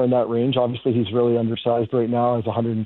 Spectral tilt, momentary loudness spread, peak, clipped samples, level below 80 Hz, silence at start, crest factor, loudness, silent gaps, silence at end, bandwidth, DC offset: -11.5 dB/octave; 2 LU; -6 dBFS; under 0.1%; -60 dBFS; 0 s; 14 dB; -21 LUFS; none; 0 s; 4.2 kHz; under 0.1%